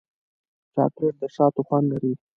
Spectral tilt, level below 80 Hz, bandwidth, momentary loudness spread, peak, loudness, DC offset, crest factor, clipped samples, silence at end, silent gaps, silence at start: -11 dB/octave; -68 dBFS; 6.6 kHz; 5 LU; -6 dBFS; -24 LUFS; under 0.1%; 18 dB; under 0.1%; 0.2 s; none; 0.75 s